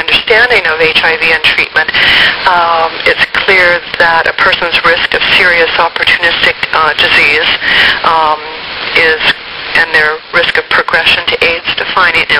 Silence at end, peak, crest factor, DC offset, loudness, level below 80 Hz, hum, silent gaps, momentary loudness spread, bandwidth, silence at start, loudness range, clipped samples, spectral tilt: 0 s; 0 dBFS; 10 dB; under 0.1%; -7 LUFS; -38 dBFS; none; none; 5 LU; over 20 kHz; 0 s; 2 LU; 1%; -3 dB/octave